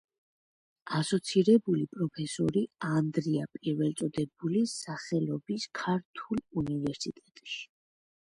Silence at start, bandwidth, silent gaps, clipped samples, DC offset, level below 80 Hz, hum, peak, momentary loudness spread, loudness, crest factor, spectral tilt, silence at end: 0.85 s; 11.5 kHz; 6.05-6.14 s; under 0.1%; under 0.1%; -66 dBFS; none; -12 dBFS; 13 LU; -31 LUFS; 20 dB; -6 dB/octave; 0.65 s